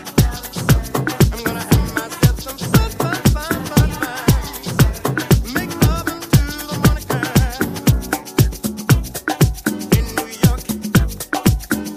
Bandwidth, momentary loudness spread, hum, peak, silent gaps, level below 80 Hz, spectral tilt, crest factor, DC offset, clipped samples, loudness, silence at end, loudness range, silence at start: 15.5 kHz; 6 LU; none; 0 dBFS; none; -24 dBFS; -5.5 dB/octave; 16 dB; under 0.1%; under 0.1%; -18 LUFS; 0 s; 1 LU; 0 s